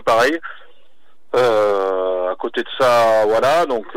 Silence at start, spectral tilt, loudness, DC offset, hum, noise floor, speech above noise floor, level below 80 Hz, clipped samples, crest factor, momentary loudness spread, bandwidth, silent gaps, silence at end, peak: 0.05 s; -4 dB/octave; -17 LUFS; 2%; none; -60 dBFS; 44 dB; -58 dBFS; under 0.1%; 12 dB; 9 LU; 16.5 kHz; none; 0 s; -6 dBFS